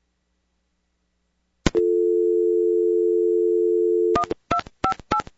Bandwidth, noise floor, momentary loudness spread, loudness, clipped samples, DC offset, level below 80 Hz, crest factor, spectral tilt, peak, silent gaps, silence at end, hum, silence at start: 8 kHz; -72 dBFS; 6 LU; -21 LUFS; under 0.1%; under 0.1%; -44 dBFS; 22 dB; -6 dB/octave; 0 dBFS; none; 0.15 s; none; 1.65 s